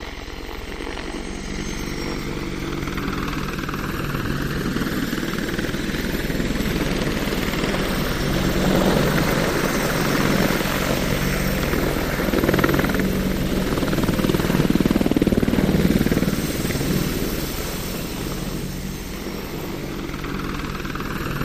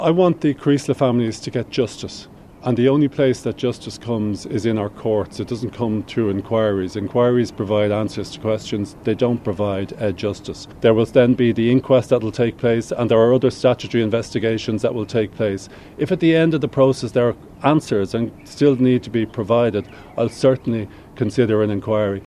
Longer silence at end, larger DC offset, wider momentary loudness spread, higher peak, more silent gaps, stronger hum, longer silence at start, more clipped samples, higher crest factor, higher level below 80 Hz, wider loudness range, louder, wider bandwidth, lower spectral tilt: about the same, 0 s vs 0.05 s; neither; about the same, 10 LU vs 10 LU; about the same, -2 dBFS vs 0 dBFS; neither; neither; about the same, 0 s vs 0 s; neither; about the same, 20 dB vs 18 dB; first, -32 dBFS vs -50 dBFS; first, 8 LU vs 4 LU; second, -23 LUFS vs -19 LUFS; first, 15.5 kHz vs 12 kHz; second, -5 dB/octave vs -7 dB/octave